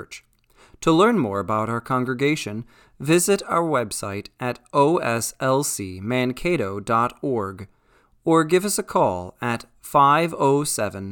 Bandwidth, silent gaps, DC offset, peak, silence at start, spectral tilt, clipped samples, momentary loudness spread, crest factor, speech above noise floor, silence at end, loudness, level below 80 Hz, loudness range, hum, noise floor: 19 kHz; none; under 0.1%; -4 dBFS; 0 s; -5 dB/octave; under 0.1%; 12 LU; 18 dB; 38 dB; 0 s; -22 LUFS; -54 dBFS; 2 LU; none; -59 dBFS